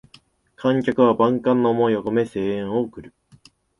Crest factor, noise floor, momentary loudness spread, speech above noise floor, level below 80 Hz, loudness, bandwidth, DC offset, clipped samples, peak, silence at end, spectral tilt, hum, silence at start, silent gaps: 18 dB; -54 dBFS; 8 LU; 35 dB; -58 dBFS; -20 LUFS; 11 kHz; under 0.1%; under 0.1%; -4 dBFS; 0.7 s; -8 dB/octave; none; 0.6 s; none